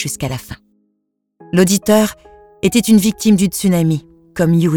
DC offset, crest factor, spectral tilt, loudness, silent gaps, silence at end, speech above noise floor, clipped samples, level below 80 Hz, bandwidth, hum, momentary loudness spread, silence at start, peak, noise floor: under 0.1%; 16 dB; -5.5 dB/octave; -15 LUFS; none; 0 s; 56 dB; under 0.1%; -44 dBFS; 19 kHz; none; 12 LU; 0 s; 0 dBFS; -70 dBFS